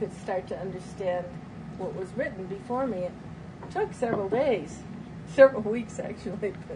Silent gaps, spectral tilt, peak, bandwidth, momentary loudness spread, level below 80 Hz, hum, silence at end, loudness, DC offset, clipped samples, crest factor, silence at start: none; -6.5 dB/octave; -4 dBFS; 10.5 kHz; 20 LU; -56 dBFS; none; 0 s; -28 LUFS; under 0.1%; under 0.1%; 24 dB; 0 s